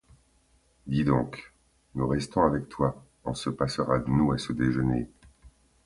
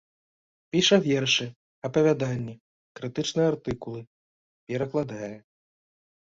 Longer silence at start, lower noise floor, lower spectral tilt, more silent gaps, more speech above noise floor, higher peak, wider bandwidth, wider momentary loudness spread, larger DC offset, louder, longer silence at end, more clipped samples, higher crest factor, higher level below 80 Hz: about the same, 0.85 s vs 0.75 s; second, -65 dBFS vs under -90 dBFS; first, -7 dB/octave vs -4.5 dB/octave; second, none vs 1.56-1.82 s, 2.60-2.95 s, 4.07-4.67 s; second, 39 dB vs over 64 dB; about the same, -8 dBFS vs -6 dBFS; first, 11.5 kHz vs 7.8 kHz; second, 13 LU vs 18 LU; neither; about the same, -28 LUFS vs -26 LUFS; second, 0.35 s vs 0.9 s; neither; about the same, 20 dB vs 22 dB; first, -46 dBFS vs -60 dBFS